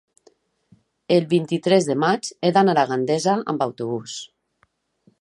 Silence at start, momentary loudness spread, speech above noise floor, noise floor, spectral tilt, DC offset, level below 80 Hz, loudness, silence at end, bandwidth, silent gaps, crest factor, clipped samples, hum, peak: 1.1 s; 11 LU; 46 dB; -66 dBFS; -5.5 dB/octave; under 0.1%; -70 dBFS; -20 LUFS; 0.95 s; 11.5 kHz; none; 18 dB; under 0.1%; none; -4 dBFS